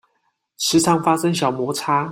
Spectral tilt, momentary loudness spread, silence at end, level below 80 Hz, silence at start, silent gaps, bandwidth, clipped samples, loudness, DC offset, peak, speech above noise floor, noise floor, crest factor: -4 dB/octave; 7 LU; 0 s; -56 dBFS; 0.6 s; none; 16.5 kHz; under 0.1%; -19 LUFS; under 0.1%; -2 dBFS; 51 dB; -69 dBFS; 18 dB